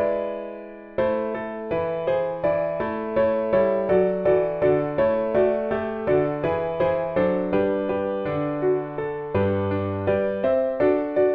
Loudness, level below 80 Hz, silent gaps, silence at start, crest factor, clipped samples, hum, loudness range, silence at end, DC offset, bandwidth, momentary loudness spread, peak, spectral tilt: -23 LUFS; -52 dBFS; none; 0 s; 14 dB; under 0.1%; none; 3 LU; 0 s; under 0.1%; 5 kHz; 6 LU; -8 dBFS; -10 dB/octave